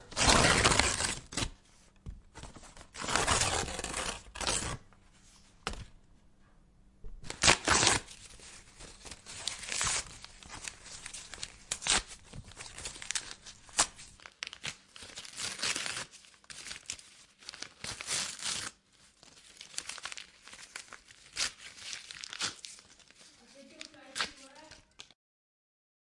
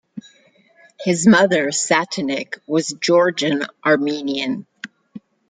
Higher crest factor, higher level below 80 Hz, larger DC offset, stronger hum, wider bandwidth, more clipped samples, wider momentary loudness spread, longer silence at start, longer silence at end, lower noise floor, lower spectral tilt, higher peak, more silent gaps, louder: first, 32 dB vs 18 dB; first, -50 dBFS vs -64 dBFS; neither; neither; first, 12 kHz vs 9.6 kHz; neither; first, 25 LU vs 20 LU; second, 0 s vs 0.15 s; first, 1.1 s vs 0.3 s; first, -64 dBFS vs -55 dBFS; second, -1.5 dB/octave vs -4 dB/octave; about the same, -4 dBFS vs -2 dBFS; neither; second, -32 LUFS vs -18 LUFS